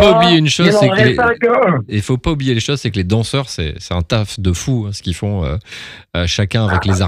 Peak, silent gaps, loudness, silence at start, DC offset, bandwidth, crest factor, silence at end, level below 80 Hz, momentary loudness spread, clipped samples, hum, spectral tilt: 0 dBFS; none; -15 LUFS; 0 s; under 0.1%; 14.5 kHz; 14 dB; 0 s; -32 dBFS; 11 LU; under 0.1%; none; -5.5 dB/octave